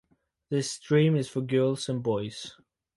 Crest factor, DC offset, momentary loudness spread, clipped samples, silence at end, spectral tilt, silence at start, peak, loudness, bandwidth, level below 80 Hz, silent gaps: 18 dB; under 0.1%; 13 LU; under 0.1%; 0.45 s; -6 dB/octave; 0.5 s; -12 dBFS; -27 LUFS; 11.5 kHz; -66 dBFS; none